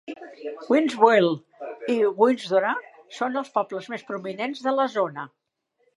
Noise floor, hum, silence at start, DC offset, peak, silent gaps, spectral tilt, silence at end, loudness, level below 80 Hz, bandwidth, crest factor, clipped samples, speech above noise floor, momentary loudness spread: -71 dBFS; none; 0.1 s; under 0.1%; -2 dBFS; none; -5.5 dB/octave; 0.7 s; -24 LUFS; -82 dBFS; 11.5 kHz; 22 dB; under 0.1%; 48 dB; 19 LU